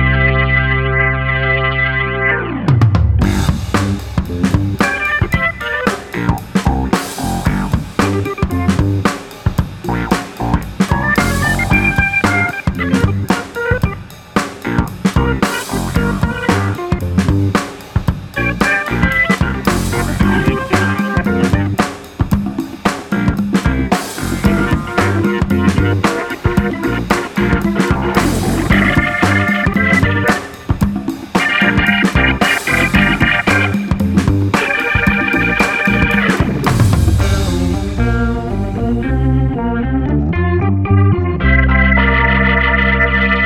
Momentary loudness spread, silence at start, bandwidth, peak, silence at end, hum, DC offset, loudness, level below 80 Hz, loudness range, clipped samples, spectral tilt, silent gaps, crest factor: 7 LU; 0 s; 17 kHz; 0 dBFS; 0 s; none; under 0.1%; -14 LUFS; -24 dBFS; 4 LU; under 0.1%; -6 dB/octave; none; 14 dB